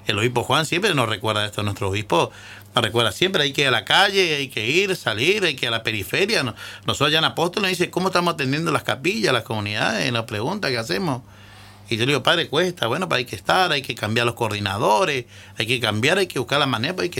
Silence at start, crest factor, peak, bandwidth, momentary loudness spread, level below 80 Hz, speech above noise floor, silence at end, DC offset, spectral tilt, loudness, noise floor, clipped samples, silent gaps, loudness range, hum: 0 s; 18 dB; -4 dBFS; 17 kHz; 7 LU; -56 dBFS; 23 dB; 0 s; under 0.1%; -4 dB/octave; -20 LUFS; -44 dBFS; under 0.1%; none; 4 LU; none